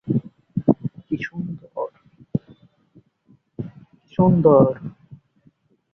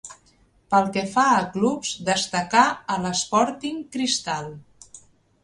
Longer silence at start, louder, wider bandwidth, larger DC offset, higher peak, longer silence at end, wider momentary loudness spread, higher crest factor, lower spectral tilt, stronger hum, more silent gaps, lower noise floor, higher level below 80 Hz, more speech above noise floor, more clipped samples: about the same, 0.05 s vs 0.05 s; about the same, -21 LUFS vs -22 LUFS; second, 6 kHz vs 11.5 kHz; neither; about the same, -2 dBFS vs -2 dBFS; first, 0.8 s vs 0.45 s; first, 21 LU vs 11 LU; about the same, 22 dB vs 22 dB; first, -11 dB/octave vs -3.5 dB/octave; neither; neither; about the same, -59 dBFS vs -59 dBFS; first, -54 dBFS vs -60 dBFS; first, 42 dB vs 37 dB; neither